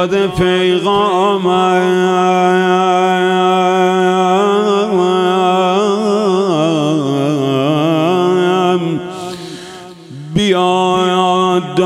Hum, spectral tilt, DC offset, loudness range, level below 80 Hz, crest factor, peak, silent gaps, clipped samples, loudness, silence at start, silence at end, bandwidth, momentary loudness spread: none; -6 dB/octave; under 0.1%; 3 LU; -48 dBFS; 12 dB; 0 dBFS; none; under 0.1%; -13 LUFS; 0 s; 0 s; 12 kHz; 8 LU